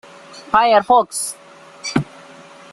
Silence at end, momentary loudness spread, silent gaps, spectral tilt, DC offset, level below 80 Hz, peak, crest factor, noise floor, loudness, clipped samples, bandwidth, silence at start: 0.7 s; 21 LU; none; -3.5 dB/octave; under 0.1%; -54 dBFS; -2 dBFS; 18 dB; -41 dBFS; -17 LUFS; under 0.1%; 13 kHz; 0.3 s